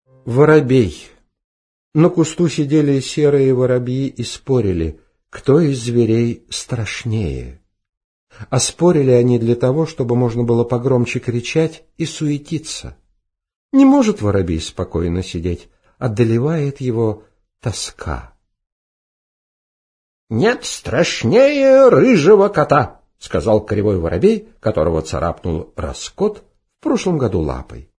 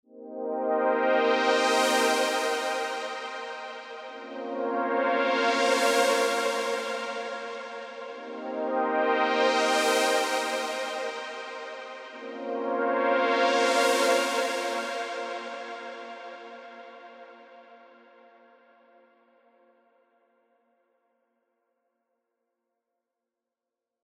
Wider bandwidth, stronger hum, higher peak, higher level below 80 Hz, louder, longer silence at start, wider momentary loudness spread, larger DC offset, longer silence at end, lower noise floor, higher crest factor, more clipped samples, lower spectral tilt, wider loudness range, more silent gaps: second, 11 kHz vs 16 kHz; neither; first, 0 dBFS vs -10 dBFS; first, -38 dBFS vs under -90 dBFS; first, -16 LUFS vs -26 LUFS; about the same, 0.25 s vs 0.15 s; second, 14 LU vs 17 LU; neither; second, 0.15 s vs 6.3 s; second, -66 dBFS vs -88 dBFS; about the same, 16 dB vs 18 dB; neither; first, -6.5 dB/octave vs -1 dB/octave; about the same, 8 LU vs 10 LU; first, 1.44-1.92 s, 7.89-8.27 s, 13.56-13.69 s, 18.72-20.27 s vs none